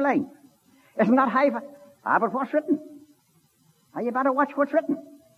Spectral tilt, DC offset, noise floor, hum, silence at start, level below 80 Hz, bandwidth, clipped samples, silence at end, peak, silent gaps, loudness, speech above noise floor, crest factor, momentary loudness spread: -7.5 dB/octave; under 0.1%; -64 dBFS; none; 0 s; -80 dBFS; 13.5 kHz; under 0.1%; 0.35 s; -8 dBFS; none; -24 LUFS; 40 dB; 18 dB; 15 LU